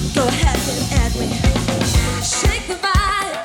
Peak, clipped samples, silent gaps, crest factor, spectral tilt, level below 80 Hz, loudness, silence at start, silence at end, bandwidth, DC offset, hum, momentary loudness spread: -2 dBFS; under 0.1%; none; 14 dB; -4 dB/octave; -22 dBFS; -18 LUFS; 0 s; 0 s; 18 kHz; under 0.1%; none; 3 LU